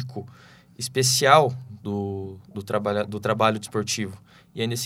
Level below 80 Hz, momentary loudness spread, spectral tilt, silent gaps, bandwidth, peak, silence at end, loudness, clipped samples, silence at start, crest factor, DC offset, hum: -66 dBFS; 19 LU; -3.5 dB/octave; none; 16.5 kHz; 0 dBFS; 0 s; -23 LUFS; under 0.1%; 0 s; 24 dB; under 0.1%; none